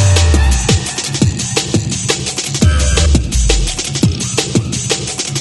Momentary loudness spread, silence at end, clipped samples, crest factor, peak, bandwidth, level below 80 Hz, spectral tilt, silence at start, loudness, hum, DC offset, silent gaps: 5 LU; 0 s; under 0.1%; 14 dB; 0 dBFS; 12 kHz; -18 dBFS; -4 dB/octave; 0 s; -14 LUFS; none; under 0.1%; none